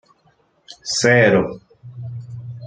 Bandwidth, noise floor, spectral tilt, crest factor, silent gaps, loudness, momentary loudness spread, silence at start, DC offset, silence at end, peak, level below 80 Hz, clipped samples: 9.6 kHz; -60 dBFS; -4.5 dB/octave; 18 dB; none; -16 LUFS; 21 LU; 0.7 s; under 0.1%; 0 s; -2 dBFS; -54 dBFS; under 0.1%